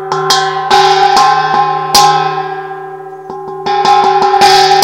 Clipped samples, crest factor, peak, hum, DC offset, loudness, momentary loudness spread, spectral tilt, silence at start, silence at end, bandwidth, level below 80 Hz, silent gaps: 1%; 10 dB; 0 dBFS; none; 0.1%; -8 LUFS; 18 LU; -2 dB/octave; 0 s; 0 s; over 20 kHz; -46 dBFS; none